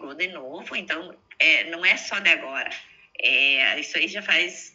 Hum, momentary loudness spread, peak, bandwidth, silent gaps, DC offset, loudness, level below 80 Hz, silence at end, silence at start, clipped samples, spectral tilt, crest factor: none; 14 LU; -4 dBFS; 8 kHz; none; under 0.1%; -21 LUFS; -76 dBFS; 0.05 s; 0 s; under 0.1%; -0.5 dB/octave; 20 dB